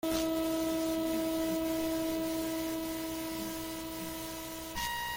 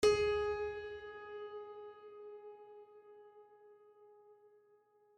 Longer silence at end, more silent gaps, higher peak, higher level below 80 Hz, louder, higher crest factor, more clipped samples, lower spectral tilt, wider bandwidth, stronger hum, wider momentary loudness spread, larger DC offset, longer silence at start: second, 0 s vs 0.85 s; neither; about the same, -20 dBFS vs -18 dBFS; first, -54 dBFS vs -64 dBFS; first, -34 LUFS vs -40 LUFS; second, 14 dB vs 22 dB; neither; about the same, -3.5 dB/octave vs -3.5 dB/octave; first, 17 kHz vs 10.5 kHz; first, 60 Hz at -60 dBFS vs none; second, 7 LU vs 28 LU; neither; about the same, 0.05 s vs 0 s